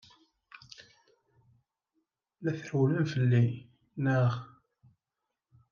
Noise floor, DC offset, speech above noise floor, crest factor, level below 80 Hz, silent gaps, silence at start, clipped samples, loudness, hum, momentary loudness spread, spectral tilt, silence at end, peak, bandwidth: -87 dBFS; under 0.1%; 60 dB; 18 dB; -76 dBFS; none; 0.8 s; under 0.1%; -30 LUFS; none; 23 LU; -8 dB/octave; 1.25 s; -14 dBFS; 7 kHz